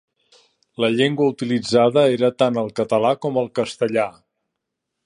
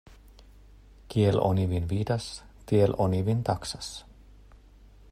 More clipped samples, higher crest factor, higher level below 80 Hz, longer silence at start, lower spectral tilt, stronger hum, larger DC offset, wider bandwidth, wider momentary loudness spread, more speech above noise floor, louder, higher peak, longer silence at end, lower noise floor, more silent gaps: neither; about the same, 18 dB vs 18 dB; second, -64 dBFS vs -50 dBFS; first, 0.8 s vs 0.1 s; about the same, -6 dB/octave vs -7 dB/octave; neither; neither; second, 10.5 kHz vs 13 kHz; second, 7 LU vs 15 LU; first, 61 dB vs 27 dB; first, -19 LUFS vs -27 LUFS; first, -2 dBFS vs -10 dBFS; second, 0.95 s vs 1.1 s; first, -80 dBFS vs -53 dBFS; neither